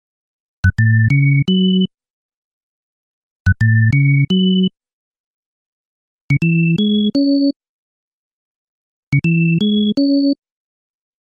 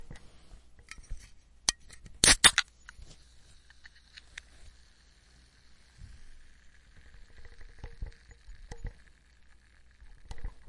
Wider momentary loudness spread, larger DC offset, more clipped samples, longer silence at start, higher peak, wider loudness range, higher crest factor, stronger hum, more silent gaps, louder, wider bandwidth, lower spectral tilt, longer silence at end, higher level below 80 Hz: second, 7 LU vs 31 LU; neither; neither; first, 0.65 s vs 0.1 s; about the same, -2 dBFS vs -2 dBFS; second, 2 LU vs 25 LU; second, 14 dB vs 34 dB; neither; first, 2.10-3.45 s, 4.93-5.12 s, 5.20-6.29 s, 7.56-7.60 s, 7.69-9.12 s vs none; first, -15 LUFS vs -23 LUFS; second, 7.2 kHz vs 11.5 kHz; first, -8 dB/octave vs 0 dB/octave; first, 0.9 s vs 0.1 s; first, -40 dBFS vs -48 dBFS